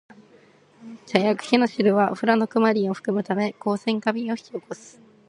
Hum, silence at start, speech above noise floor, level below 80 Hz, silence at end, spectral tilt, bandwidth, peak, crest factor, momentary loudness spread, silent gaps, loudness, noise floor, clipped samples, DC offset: none; 0.8 s; 32 dB; -72 dBFS; 0.4 s; -6 dB/octave; 11 kHz; 0 dBFS; 22 dB; 16 LU; none; -22 LUFS; -54 dBFS; under 0.1%; under 0.1%